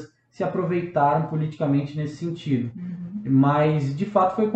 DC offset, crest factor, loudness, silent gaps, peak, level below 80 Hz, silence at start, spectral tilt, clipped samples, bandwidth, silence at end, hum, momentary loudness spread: under 0.1%; 16 dB; -23 LUFS; none; -6 dBFS; -62 dBFS; 0 s; -9 dB/octave; under 0.1%; 8 kHz; 0 s; none; 11 LU